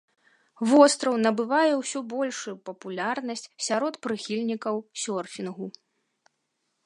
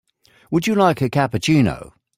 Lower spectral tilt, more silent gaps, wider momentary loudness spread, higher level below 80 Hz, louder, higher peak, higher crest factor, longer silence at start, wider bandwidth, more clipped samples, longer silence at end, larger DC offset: second, -3.5 dB/octave vs -6 dB/octave; neither; first, 16 LU vs 6 LU; second, -80 dBFS vs -48 dBFS; second, -26 LUFS vs -18 LUFS; about the same, -4 dBFS vs -4 dBFS; first, 22 dB vs 16 dB; about the same, 0.6 s vs 0.5 s; second, 11.5 kHz vs 16 kHz; neither; first, 1.15 s vs 0.35 s; neither